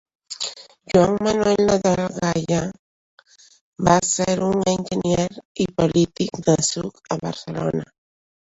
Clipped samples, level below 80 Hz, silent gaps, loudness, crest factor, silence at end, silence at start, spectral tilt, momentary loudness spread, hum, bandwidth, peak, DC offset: under 0.1%; -48 dBFS; 2.79-3.18 s, 3.61-3.73 s, 5.45-5.55 s; -21 LUFS; 20 dB; 0.6 s; 0.3 s; -5 dB/octave; 11 LU; none; 8.2 kHz; -2 dBFS; under 0.1%